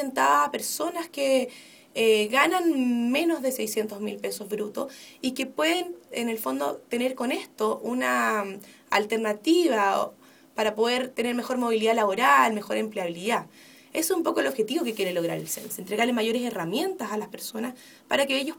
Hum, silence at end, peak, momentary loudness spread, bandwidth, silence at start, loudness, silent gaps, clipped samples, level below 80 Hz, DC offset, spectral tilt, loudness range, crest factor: none; 0 s; -6 dBFS; 11 LU; 19.5 kHz; 0 s; -26 LUFS; none; under 0.1%; -74 dBFS; under 0.1%; -3 dB/octave; 5 LU; 20 dB